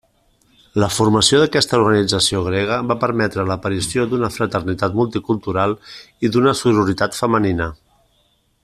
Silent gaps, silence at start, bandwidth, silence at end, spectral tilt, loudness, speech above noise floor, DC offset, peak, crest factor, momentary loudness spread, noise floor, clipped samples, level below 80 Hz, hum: none; 0.75 s; 14 kHz; 0.9 s; -4.5 dB/octave; -17 LUFS; 44 dB; under 0.1%; 0 dBFS; 18 dB; 7 LU; -61 dBFS; under 0.1%; -46 dBFS; none